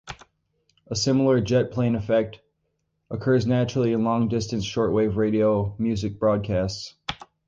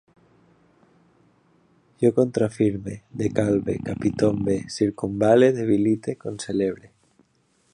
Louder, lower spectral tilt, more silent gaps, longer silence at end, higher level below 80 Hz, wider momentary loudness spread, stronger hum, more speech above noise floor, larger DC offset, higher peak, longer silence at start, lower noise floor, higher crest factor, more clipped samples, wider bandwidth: about the same, -23 LUFS vs -23 LUFS; about the same, -6.5 dB/octave vs -7 dB/octave; neither; second, 0.3 s vs 1 s; about the same, -48 dBFS vs -52 dBFS; about the same, 12 LU vs 10 LU; neither; first, 52 dB vs 43 dB; neither; second, -8 dBFS vs -4 dBFS; second, 0.05 s vs 2 s; first, -74 dBFS vs -65 dBFS; about the same, 16 dB vs 18 dB; neither; second, 8 kHz vs 10.5 kHz